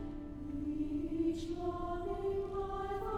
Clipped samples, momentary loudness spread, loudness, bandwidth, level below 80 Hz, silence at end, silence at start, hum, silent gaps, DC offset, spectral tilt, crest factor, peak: under 0.1%; 6 LU; -39 LUFS; 11 kHz; -48 dBFS; 0 s; 0 s; none; none; under 0.1%; -7.5 dB/octave; 14 dB; -24 dBFS